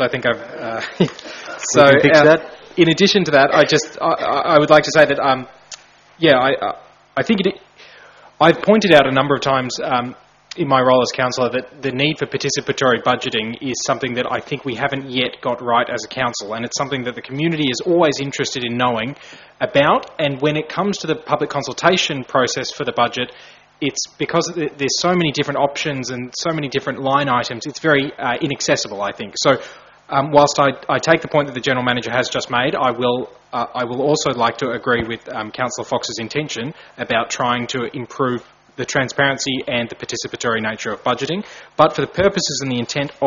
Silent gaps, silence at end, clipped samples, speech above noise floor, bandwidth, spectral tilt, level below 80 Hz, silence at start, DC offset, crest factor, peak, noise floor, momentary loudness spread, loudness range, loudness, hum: none; 0 s; under 0.1%; 27 dB; 7.6 kHz; -3 dB/octave; -54 dBFS; 0 s; under 0.1%; 18 dB; 0 dBFS; -44 dBFS; 12 LU; 7 LU; -18 LUFS; none